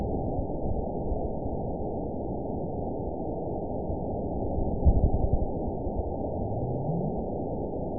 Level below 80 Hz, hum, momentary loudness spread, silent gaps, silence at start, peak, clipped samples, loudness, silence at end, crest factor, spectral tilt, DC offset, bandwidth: -34 dBFS; none; 6 LU; none; 0 s; -10 dBFS; under 0.1%; -31 LUFS; 0 s; 18 dB; -17.5 dB/octave; 0.8%; 1 kHz